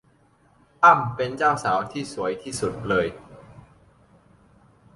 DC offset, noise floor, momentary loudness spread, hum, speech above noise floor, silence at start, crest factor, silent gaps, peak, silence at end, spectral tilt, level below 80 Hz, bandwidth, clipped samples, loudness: under 0.1%; -60 dBFS; 13 LU; none; 38 dB; 0.8 s; 22 dB; none; -2 dBFS; 1.35 s; -5 dB/octave; -56 dBFS; 11.5 kHz; under 0.1%; -22 LUFS